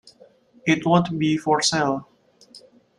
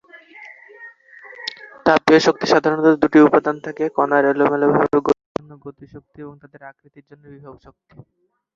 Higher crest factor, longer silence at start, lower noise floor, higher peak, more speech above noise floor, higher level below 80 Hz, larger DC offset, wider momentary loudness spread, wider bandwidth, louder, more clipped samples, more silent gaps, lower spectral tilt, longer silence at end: about the same, 18 dB vs 18 dB; first, 0.65 s vs 0.4 s; first, -53 dBFS vs -43 dBFS; second, -4 dBFS vs 0 dBFS; first, 33 dB vs 25 dB; about the same, -62 dBFS vs -58 dBFS; neither; second, 8 LU vs 26 LU; first, 11.5 kHz vs 7.6 kHz; second, -21 LUFS vs -16 LUFS; neither; second, none vs 5.26-5.35 s; about the same, -4.5 dB/octave vs -5.5 dB/octave; second, 0.4 s vs 1.05 s